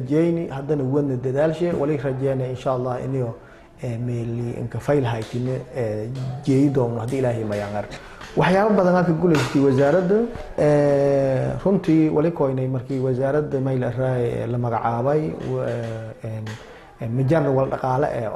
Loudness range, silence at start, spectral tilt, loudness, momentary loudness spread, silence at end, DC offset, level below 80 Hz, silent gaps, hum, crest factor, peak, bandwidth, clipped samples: 7 LU; 0 s; -8 dB/octave; -22 LUFS; 11 LU; 0 s; under 0.1%; -48 dBFS; none; none; 14 dB; -6 dBFS; 12.5 kHz; under 0.1%